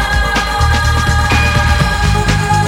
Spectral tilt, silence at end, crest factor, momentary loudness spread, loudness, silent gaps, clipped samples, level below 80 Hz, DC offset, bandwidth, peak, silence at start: -4.5 dB/octave; 0 s; 12 dB; 2 LU; -12 LUFS; none; under 0.1%; -16 dBFS; under 0.1%; 16.5 kHz; 0 dBFS; 0 s